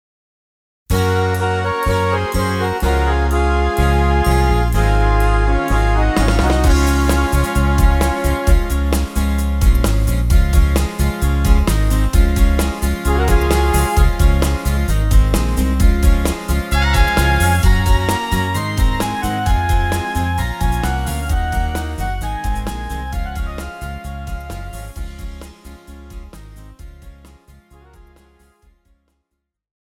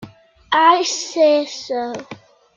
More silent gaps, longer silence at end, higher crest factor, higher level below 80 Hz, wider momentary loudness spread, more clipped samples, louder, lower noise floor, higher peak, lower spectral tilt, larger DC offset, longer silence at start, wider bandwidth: neither; first, 2.7 s vs 0.4 s; about the same, 14 dB vs 18 dB; first, -18 dBFS vs -62 dBFS; about the same, 12 LU vs 12 LU; neither; about the same, -17 LUFS vs -17 LUFS; first, -76 dBFS vs -42 dBFS; about the same, -2 dBFS vs -2 dBFS; first, -5.5 dB/octave vs -2 dB/octave; neither; first, 0.9 s vs 0 s; first, 17 kHz vs 7.6 kHz